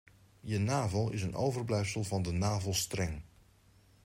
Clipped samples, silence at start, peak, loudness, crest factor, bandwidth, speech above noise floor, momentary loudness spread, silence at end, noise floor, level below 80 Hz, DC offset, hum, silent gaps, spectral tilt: under 0.1%; 0.45 s; -18 dBFS; -34 LUFS; 16 dB; 16 kHz; 31 dB; 6 LU; 0.8 s; -64 dBFS; -56 dBFS; under 0.1%; none; none; -5 dB/octave